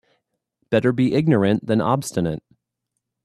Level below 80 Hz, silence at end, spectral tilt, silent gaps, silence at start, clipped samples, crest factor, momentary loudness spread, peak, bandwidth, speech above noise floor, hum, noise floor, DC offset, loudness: -56 dBFS; 0.85 s; -7 dB/octave; none; 0.7 s; under 0.1%; 18 dB; 7 LU; -4 dBFS; 14 kHz; 61 dB; none; -79 dBFS; under 0.1%; -20 LUFS